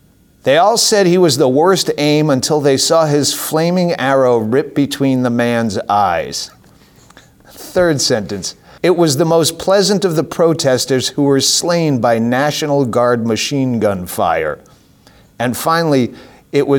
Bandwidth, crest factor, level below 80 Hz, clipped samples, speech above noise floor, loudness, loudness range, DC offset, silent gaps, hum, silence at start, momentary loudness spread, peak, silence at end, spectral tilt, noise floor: over 20 kHz; 12 dB; -50 dBFS; under 0.1%; 33 dB; -14 LUFS; 5 LU; under 0.1%; none; none; 0.45 s; 8 LU; -2 dBFS; 0 s; -4.5 dB/octave; -46 dBFS